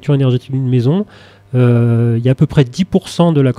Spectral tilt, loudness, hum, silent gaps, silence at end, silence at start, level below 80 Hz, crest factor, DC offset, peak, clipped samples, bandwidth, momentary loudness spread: -8 dB/octave; -14 LUFS; none; none; 0.05 s; 0.05 s; -44 dBFS; 12 dB; under 0.1%; 0 dBFS; under 0.1%; 10.5 kHz; 5 LU